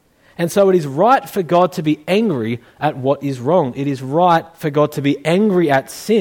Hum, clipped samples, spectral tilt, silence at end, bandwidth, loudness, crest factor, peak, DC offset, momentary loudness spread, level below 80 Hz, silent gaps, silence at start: none; under 0.1%; -6.5 dB/octave; 0 s; 18 kHz; -16 LUFS; 14 dB; -2 dBFS; under 0.1%; 7 LU; -60 dBFS; none; 0.4 s